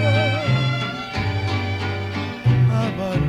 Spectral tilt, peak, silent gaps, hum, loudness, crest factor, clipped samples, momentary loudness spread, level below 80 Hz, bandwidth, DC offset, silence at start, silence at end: -7 dB/octave; -6 dBFS; none; none; -21 LUFS; 14 dB; under 0.1%; 7 LU; -42 dBFS; 9 kHz; under 0.1%; 0 s; 0 s